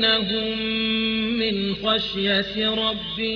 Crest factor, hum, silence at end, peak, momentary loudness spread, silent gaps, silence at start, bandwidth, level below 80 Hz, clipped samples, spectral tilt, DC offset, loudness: 16 dB; none; 0 s; -8 dBFS; 3 LU; none; 0 s; 5.4 kHz; -48 dBFS; under 0.1%; -6 dB/octave; under 0.1%; -22 LUFS